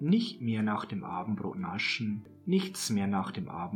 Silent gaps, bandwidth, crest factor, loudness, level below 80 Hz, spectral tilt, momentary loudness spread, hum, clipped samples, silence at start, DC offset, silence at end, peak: none; 18 kHz; 16 dB; -32 LUFS; -70 dBFS; -5 dB/octave; 7 LU; none; under 0.1%; 0 s; under 0.1%; 0 s; -16 dBFS